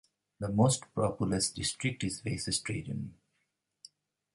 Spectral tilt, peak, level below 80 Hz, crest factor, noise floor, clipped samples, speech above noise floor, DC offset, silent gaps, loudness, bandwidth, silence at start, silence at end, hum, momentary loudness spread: -4.5 dB/octave; -14 dBFS; -56 dBFS; 20 dB; -81 dBFS; under 0.1%; 49 dB; under 0.1%; none; -32 LUFS; 11.5 kHz; 0.4 s; 1.2 s; none; 12 LU